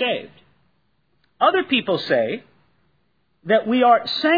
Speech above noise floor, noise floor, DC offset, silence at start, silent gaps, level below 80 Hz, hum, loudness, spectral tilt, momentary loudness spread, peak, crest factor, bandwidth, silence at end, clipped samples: 49 dB; -68 dBFS; under 0.1%; 0 s; none; -68 dBFS; none; -19 LUFS; -6 dB/octave; 12 LU; -2 dBFS; 18 dB; 5 kHz; 0 s; under 0.1%